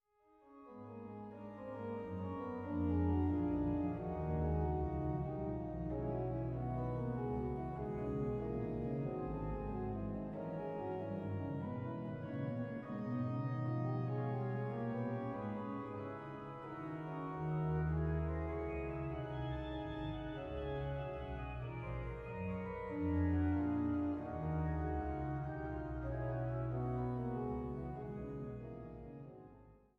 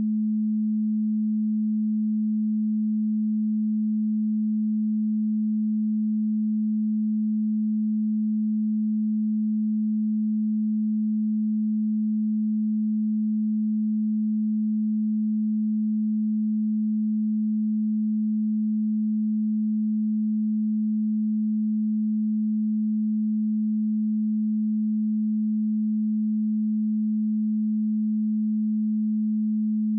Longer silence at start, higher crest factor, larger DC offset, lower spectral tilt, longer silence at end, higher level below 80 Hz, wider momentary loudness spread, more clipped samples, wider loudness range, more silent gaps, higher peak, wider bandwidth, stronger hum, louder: first, 0.45 s vs 0 s; first, 16 dB vs 4 dB; neither; second, -10.5 dB/octave vs -26 dB/octave; first, 0.2 s vs 0 s; first, -50 dBFS vs under -90 dBFS; first, 10 LU vs 0 LU; neither; first, 4 LU vs 0 LU; neither; about the same, -24 dBFS vs -22 dBFS; first, 5.2 kHz vs 0.3 kHz; neither; second, -41 LUFS vs -25 LUFS